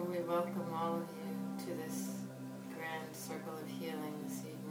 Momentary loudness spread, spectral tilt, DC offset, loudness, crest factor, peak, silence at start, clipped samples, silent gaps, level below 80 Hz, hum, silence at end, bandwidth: 8 LU; -5.5 dB/octave; under 0.1%; -42 LUFS; 16 dB; -24 dBFS; 0 s; under 0.1%; none; -84 dBFS; none; 0 s; 19 kHz